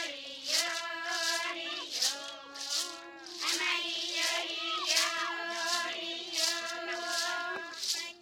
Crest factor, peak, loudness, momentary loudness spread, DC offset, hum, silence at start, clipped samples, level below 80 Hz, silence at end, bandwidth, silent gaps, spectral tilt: 22 dB; -12 dBFS; -32 LUFS; 9 LU; under 0.1%; none; 0 s; under 0.1%; -84 dBFS; 0 s; 16.5 kHz; none; 2 dB/octave